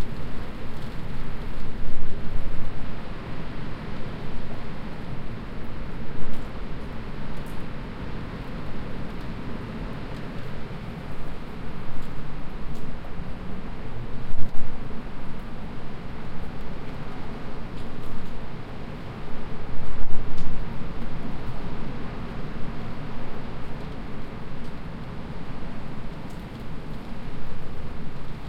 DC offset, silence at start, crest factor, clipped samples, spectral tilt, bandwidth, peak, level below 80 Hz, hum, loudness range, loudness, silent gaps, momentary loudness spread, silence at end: under 0.1%; 0 s; 16 dB; under 0.1%; -7.5 dB/octave; 5.2 kHz; -2 dBFS; -34 dBFS; none; 2 LU; -37 LUFS; none; 3 LU; 0 s